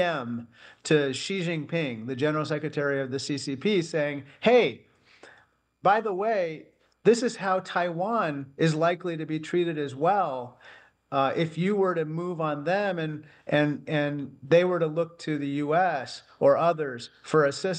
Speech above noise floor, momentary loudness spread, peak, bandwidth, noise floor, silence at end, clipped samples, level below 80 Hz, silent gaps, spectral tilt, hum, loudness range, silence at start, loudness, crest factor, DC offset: 35 dB; 10 LU; -8 dBFS; 10 kHz; -61 dBFS; 0 s; under 0.1%; -74 dBFS; none; -6 dB/octave; none; 2 LU; 0 s; -27 LUFS; 18 dB; under 0.1%